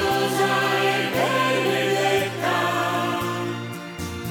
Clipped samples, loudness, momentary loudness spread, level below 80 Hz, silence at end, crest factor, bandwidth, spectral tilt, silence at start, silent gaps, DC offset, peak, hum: under 0.1%; -22 LUFS; 11 LU; -54 dBFS; 0 s; 14 dB; over 20 kHz; -4 dB/octave; 0 s; none; under 0.1%; -8 dBFS; none